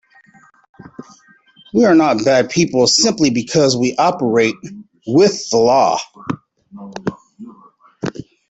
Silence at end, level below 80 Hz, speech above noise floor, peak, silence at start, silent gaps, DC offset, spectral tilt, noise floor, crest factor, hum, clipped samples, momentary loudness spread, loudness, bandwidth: 0.25 s; -54 dBFS; 36 dB; -2 dBFS; 1 s; none; under 0.1%; -4 dB/octave; -50 dBFS; 16 dB; none; under 0.1%; 16 LU; -14 LUFS; 8.4 kHz